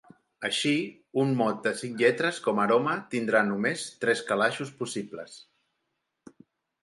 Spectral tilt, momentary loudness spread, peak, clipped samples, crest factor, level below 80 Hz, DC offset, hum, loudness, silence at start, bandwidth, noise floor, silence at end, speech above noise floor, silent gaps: -4.5 dB/octave; 10 LU; -8 dBFS; under 0.1%; 20 dB; -76 dBFS; under 0.1%; none; -27 LUFS; 0.4 s; 11.5 kHz; -80 dBFS; 1.45 s; 53 dB; none